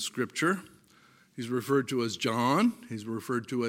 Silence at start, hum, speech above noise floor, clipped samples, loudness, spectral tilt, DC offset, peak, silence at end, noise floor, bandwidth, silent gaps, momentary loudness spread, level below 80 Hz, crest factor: 0 s; none; 31 dB; under 0.1%; -30 LUFS; -5 dB/octave; under 0.1%; -14 dBFS; 0 s; -61 dBFS; 17 kHz; none; 12 LU; -78 dBFS; 18 dB